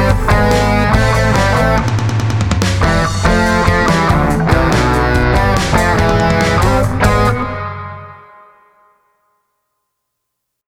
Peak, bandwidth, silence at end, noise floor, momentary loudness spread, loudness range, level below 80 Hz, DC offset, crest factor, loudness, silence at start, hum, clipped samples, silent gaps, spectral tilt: 0 dBFS; 16.5 kHz; 2.5 s; -74 dBFS; 4 LU; 7 LU; -22 dBFS; under 0.1%; 14 dB; -13 LUFS; 0 s; none; under 0.1%; none; -6 dB/octave